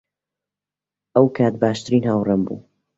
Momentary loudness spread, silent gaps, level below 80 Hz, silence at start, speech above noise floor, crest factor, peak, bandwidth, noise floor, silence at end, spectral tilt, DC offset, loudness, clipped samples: 7 LU; none; -56 dBFS; 1.15 s; 70 dB; 18 dB; -2 dBFS; 8 kHz; -88 dBFS; 0.35 s; -7.5 dB/octave; under 0.1%; -19 LUFS; under 0.1%